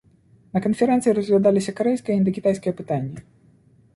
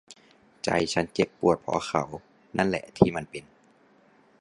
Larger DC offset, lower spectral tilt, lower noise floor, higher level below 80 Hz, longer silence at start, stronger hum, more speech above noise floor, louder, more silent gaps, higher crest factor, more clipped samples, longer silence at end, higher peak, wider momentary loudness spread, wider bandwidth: neither; first, -7 dB/octave vs -5.5 dB/octave; second, -55 dBFS vs -60 dBFS; about the same, -58 dBFS vs -54 dBFS; first, 0.55 s vs 0.1 s; neither; about the same, 35 dB vs 34 dB; first, -21 LUFS vs -27 LUFS; neither; second, 16 dB vs 26 dB; neither; second, 0.75 s vs 1 s; second, -6 dBFS vs -2 dBFS; second, 9 LU vs 13 LU; about the same, 11.5 kHz vs 11.5 kHz